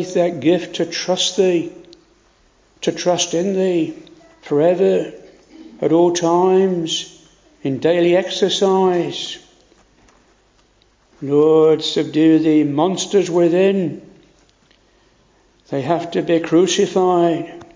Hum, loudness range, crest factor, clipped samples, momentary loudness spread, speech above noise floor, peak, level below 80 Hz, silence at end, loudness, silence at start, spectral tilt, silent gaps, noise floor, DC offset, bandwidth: none; 5 LU; 14 dB; under 0.1%; 11 LU; 40 dB; -2 dBFS; -60 dBFS; 0.1 s; -17 LUFS; 0 s; -5 dB/octave; none; -56 dBFS; under 0.1%; 7.6 kHz